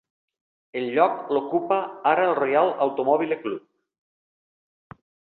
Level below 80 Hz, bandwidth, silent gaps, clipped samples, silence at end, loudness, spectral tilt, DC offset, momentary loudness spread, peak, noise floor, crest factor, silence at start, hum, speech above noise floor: -72 dBFS; 4.4 kHz; none; under 0.1%; 1.8 s; -23 LUFS; -9 dB/octave; under 0.1%; 10 LU; -4 dBFS; under -90 dBFS; 20 dB; 0.75 s; none; over 68 dB